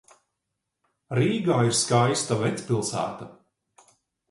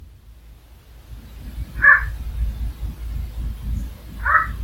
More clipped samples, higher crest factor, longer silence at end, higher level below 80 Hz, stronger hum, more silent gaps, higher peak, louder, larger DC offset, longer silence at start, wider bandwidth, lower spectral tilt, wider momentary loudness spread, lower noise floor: neither; about the same, 20 dB vs 22 dB; first, 1.05 s vs 0 s; second, -64 dBFS vs -30 dBFS; neither; neither; second, -6 dBFS vs 0 dBFS; second, -24 LUFS vs -20 LUFS; neither; first, 1.1 s vs 0 s; second, 11.5 kHz vs 16.5 kHz; about the same, -4.5 dB/octave vs -5.5 dB/octave; second, 11 LU vs 22 LU; first, -82 dBFS vs -45 dBFS